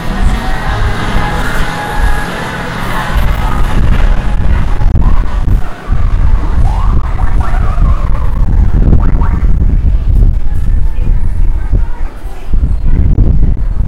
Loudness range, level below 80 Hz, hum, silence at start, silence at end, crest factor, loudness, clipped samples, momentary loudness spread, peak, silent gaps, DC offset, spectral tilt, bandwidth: 2 LU; -10 dBFS; none; 0 s; 0 s; 8 dB; -14 LUFS; 2%; 5 LU; 0 dBFS; none; under 0.1%; -6.5 dB/octave; 11.5 kHz